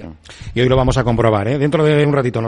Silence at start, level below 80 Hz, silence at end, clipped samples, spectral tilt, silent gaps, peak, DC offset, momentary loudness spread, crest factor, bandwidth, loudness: 0 s; -32 dBFS; 0 s; under 0.1%; -7 dB/octave; none; -2 dBFS; under 0.1%; 12 LU; 14 dB; 10.5 kHz; -15 LUFS